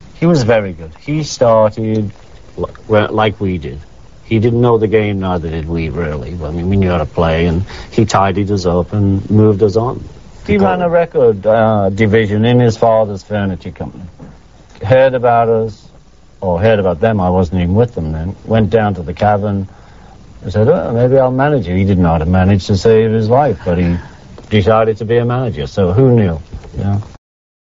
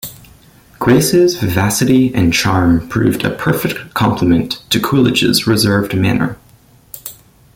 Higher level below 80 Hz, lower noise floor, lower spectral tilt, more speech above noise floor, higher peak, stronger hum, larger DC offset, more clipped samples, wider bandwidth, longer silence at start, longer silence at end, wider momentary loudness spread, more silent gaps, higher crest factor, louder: first, -34 dBFS vs -40 dBFS; about the same, -43 dBFS vs -46 dBFS; first, -7 dB/octave vs -5 dB/octave; about the same, 30 dB vs 33 dB; about the same, 0 dBFS vs 0 dBFS; neither; first, 0.6% vs under 0.1%; neither; second, 7.8 kHz vs 17 kHz; about the same, 0.15 s vs 0.05 s; first, 0.6 s vs 0.4 s; first, 12 LU vs 9 LU; neither; about the same, 14 dB vs 14 dB; about the same, -13 LUFS vs -13 LUFS